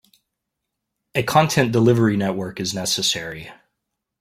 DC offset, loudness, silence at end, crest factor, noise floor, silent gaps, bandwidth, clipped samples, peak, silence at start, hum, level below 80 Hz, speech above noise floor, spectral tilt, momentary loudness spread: under 0.1%; -19 LUFS; 0.7 s; 20 dB; -80 dBFS; none; 16.5 kHz; under 0.1%; -2 dBFS; 1.15 s; none; -56 dBFS; 61 dB; -4.5 dB/octave; 10 LU